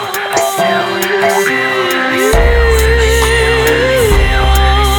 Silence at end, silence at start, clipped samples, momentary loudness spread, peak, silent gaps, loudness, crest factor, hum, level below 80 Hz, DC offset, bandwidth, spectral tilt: 0 s; 0 s; under 0.1%; 3 LU; 0 dBFS; none; -11 LUFS; 10 dB; none; -14 dBFS; under 0.1%; 19 kHz; -4 dB/octave